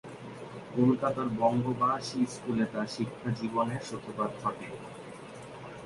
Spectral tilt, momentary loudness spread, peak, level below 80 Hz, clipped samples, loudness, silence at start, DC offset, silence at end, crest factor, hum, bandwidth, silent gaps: -6.5 dB/octave; 17 LU; -14 dBFS; -64 dBFS; under 0.1%; -31 LUFS; 0.05 s; under 0.1%; 0 s; 18 dB; none; 11.5 kHz; none